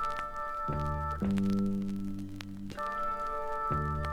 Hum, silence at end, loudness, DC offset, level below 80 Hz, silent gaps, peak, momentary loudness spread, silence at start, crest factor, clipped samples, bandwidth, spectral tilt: none; 0 s; -34 LUFS; under 0.1%; -44 dBFS; none; -16 dBFS; 10 LU; 0 s; 18 dB; under 0.1%; 14.5 kHz; -7.5 dB/octave